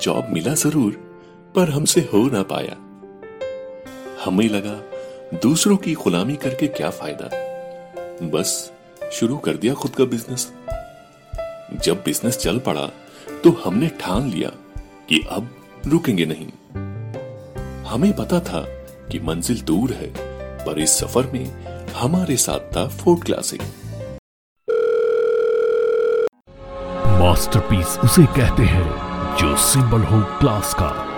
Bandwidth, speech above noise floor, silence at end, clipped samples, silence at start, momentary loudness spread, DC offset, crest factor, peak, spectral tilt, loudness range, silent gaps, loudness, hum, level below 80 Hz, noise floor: 19 kHz; 24 dB; 0 s; under 0.1%; 0 s; 18 LU; under 0.1%; 20 dB; 0 dBFS; -5 dB/octave; 7 LU; 24.19-24.56 s; -19 LUFS; none; -34 dBFS; -43 dBFS